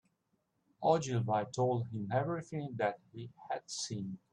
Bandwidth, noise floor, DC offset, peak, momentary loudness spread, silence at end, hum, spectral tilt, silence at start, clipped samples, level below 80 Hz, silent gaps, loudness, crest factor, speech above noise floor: 11 kHz; -80 dBFS; under 0.1%; -16 dBFS; 11 LU; 0.15 s; none; -5.5 dB/octave; 0.8 s; under 0.1%; -74 dBFS; none; -36 LUFS; 20 dB; 44 dB